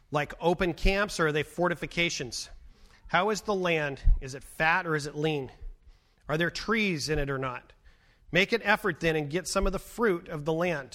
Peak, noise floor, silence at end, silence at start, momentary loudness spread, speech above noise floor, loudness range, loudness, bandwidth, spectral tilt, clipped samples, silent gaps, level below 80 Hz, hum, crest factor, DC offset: -10 dBFS; -59 dBFS; 0.05 s; 0.1 s; 8 LU; 31 dB; 2 LU; -29 LUFS; 16 kHz; -4.5 dB/octave; under 0.1%; none; -36 dBFS; none; 20 dB; under 0.1%